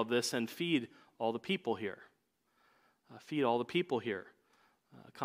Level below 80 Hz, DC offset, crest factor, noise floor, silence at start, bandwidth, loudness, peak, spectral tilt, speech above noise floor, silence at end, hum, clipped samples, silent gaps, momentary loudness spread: -86 dBFS; under 0.1%; 20 dB; -77 dBFS; 0 s; 15.5 kHz; -36 LUFS; -18 dBFS; -4.5 dB/octave; 41 dB; 0 s; none; under 0.1%; none; 16 LU